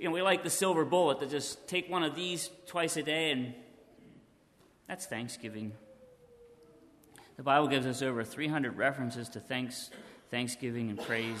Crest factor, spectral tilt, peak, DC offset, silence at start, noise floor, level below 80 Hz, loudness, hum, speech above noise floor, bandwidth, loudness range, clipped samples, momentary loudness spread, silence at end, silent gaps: 22 dB; -4 dB/octave; -12 dBFS; under 0.1%; 0 s; -65 dBFS; -74 dBFS; -33 LUFS; none; 32 dB; 13.5 kHz; 14 LU; under 0.1%; 14 LU; 0 s; none